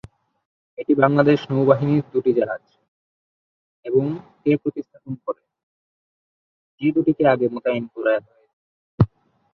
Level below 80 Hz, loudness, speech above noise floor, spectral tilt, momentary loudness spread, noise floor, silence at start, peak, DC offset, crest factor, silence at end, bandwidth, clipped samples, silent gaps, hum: -50 dBFS; -20 LUFS; over 70 dB; -9.5 dB/octave; 15 LU; under -90 dBFS; 0.8 s; -2 dBFS; under 0.1%; 20 dB; 0.5 s; 6 kHz; under 0.1%; 2.88-3.83 s, 5.63-6.78 s, 8.53-8.98 s; none